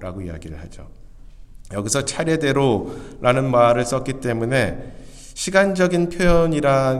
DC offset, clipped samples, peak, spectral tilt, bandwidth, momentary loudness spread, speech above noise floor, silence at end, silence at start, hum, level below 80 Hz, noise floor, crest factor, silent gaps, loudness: under 0.1%; under 0.1%; 0 dBFS; -5 dB/octave; 14 kHz; 19 LU; 20 dB; 0 s; 0 s; none; -36 dBFS; -39 dBFS; 20 dB; none; -19 LUFS